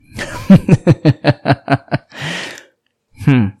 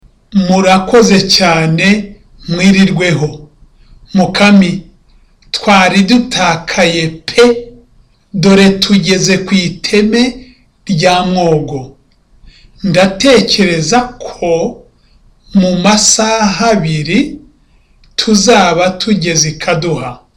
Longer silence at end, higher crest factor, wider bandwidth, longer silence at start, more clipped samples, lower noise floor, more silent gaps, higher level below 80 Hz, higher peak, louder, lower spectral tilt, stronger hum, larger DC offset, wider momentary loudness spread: about the same, 0.1 s vs 0.2 s; about the same, 14 dB vs 10 dB; about the same, 12.5 kHz vs 13 kHz; second, 0.15 s vs 0.3 s; neither; first, -57 dBFS vs -47 dBFS; neither; about the same, -40 dBFS vs -38 dBFS; about the same, 0 dBFS vs 0 dBFS; second, -14 LUFS vs -10 LUFS; first, -7.5 dB/octave vs -4 dB/octave; neither; neither; first, 15 LU vs 12 LU